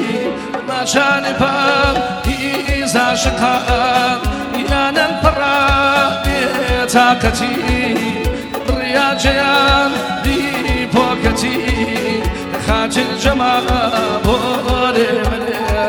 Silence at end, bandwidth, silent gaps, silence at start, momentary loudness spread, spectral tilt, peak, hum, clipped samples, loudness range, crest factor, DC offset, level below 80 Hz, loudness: 0 s; over 20 kHz; none; 0 s; 7 LU; -4.5 dB/octave; 0 dBFS; none; under 0.1%; 2 LU; 14 dB; under 0.1%; -26 dBFS; -15 LUFS